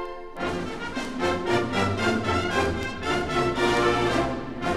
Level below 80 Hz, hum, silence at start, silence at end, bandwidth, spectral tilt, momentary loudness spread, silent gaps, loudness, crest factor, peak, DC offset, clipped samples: -42 dBFS; none; 0 s; 0 s; 13.5 kHz; -5 dB/octave; 9 LU; none; -25 LUFS; 16 dB; -10 dBFS; under 0.1%; under 0.1%